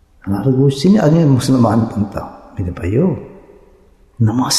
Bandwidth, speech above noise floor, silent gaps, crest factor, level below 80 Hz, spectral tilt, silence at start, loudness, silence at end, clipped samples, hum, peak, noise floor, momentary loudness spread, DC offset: 14 kHz; 35 dB; none; 14 dB; -44 dBFS; -6.5 dB/octave; 0.25 s; -15 LUFS; 0 s; under 0.1%; none; -2 dBFS; -48 dBFS; 14 LU; under 0.1%